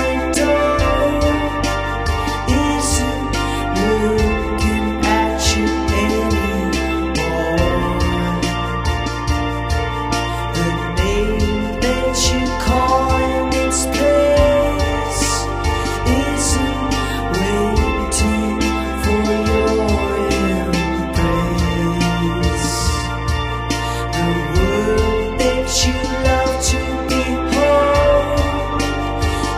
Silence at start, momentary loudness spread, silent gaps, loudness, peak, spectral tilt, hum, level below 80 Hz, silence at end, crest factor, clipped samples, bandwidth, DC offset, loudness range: 0 s; 5 LU; none; -17 LUFS; -2 dBFS; -4.5 dB/octave; none; -24 dBFS; 0 s; 16 dB; under 0.1%; 15.5 kHz; under 0.1%; 3 LU